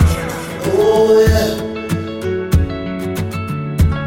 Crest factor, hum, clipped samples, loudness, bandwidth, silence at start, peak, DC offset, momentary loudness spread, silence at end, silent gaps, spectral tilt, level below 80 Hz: 14 dB; none; under 0.1%; -16 LUFS; 17 kHz; 0 s; -2 dBFS; under 0.1%; 11 LU; 0 s; none; -6.5 dB/octave; -24 dBFS